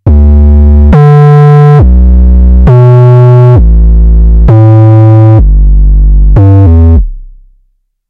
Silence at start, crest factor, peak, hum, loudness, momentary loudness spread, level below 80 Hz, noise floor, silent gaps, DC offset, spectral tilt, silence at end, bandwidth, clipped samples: 0.05 s; 2 dB; 0 dBFS; none; -3 LUFS; 5 LU; -4 dBFS; -52 dBFS; none; 1%; -11 dB/octave; 0.85 s; 3.9 kHz; 30%